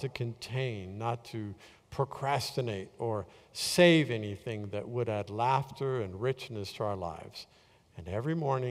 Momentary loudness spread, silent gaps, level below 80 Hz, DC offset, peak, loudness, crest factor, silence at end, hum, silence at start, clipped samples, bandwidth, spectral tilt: 16 LU; none; -64 dBFS; under 0.1%; -10 dBFS; -32 LUFS; 24 dB; 0 s; none; 0 s; under 0.1%; 16 kHz; -5.5 dB/octave